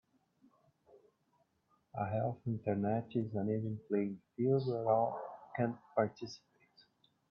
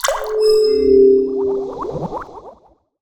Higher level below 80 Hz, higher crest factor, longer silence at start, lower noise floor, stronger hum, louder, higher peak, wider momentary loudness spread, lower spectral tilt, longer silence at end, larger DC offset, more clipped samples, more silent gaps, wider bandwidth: second, -76 dBFS vs -44 dBFS; about the same, 20 dB vs 16 dB; first, 1.95 s vs 0.05 s; first, -77 dBFS vs -50 dBFS; neither; second, -37 LUFS vs -15 LUFS; second, -18 dBFS vs 0 dBFS; second, 13 LU vs 16 LU; first, -8.5 dB/octave vs -4.5 dB/octave; first, 0.95 s vs 0.5 s; neither; neither; neither; second, 6.8 kHz vs over 20 kHz